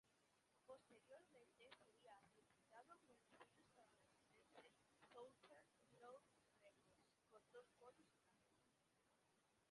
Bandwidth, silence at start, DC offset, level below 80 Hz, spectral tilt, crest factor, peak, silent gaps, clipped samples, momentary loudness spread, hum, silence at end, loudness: 11 kHz; 0.05 s; under 0.1%; under -90 dBFS; -3.5 dB/octave; 22 dB; -50 dBFS; none; under 0.1%; 4 LU; none; 0 s; -68 LUFS